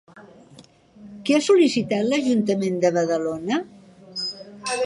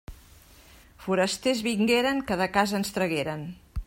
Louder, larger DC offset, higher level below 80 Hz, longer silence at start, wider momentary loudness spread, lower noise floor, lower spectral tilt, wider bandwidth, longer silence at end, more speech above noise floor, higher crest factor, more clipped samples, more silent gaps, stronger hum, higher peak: first, -22 LUFS vs -26 LUFS; neither; second, -64 dBFS vs -46 dBFS; about the same, 0.15 s vs 0.1 s; about the same, 13 LU vs 11 LU; about the same, -50 dBFS vs -53 dBFS; about the same, -5 dB/octave vs -4.5 dB/octave; second, 11.5 kHz vs 16.5 kHz; about the same, 0 s vs 0.05 s; about the same, 30 dB vs 27 dB; about the same, 16 dB vs 20 dB; neither; neither; neither; about the same, -6 dBFS vs -8 dBFS